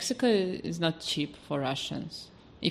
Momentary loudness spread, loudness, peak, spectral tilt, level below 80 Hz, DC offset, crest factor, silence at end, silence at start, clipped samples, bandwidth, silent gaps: 14 LU; -31 LUFS; -12 dBFS; -4.5 dB/octave; -62 dBFS; under 0.1%; 18 dB; 0 s; 0 s; under 0.1%; 14.5 kHz; none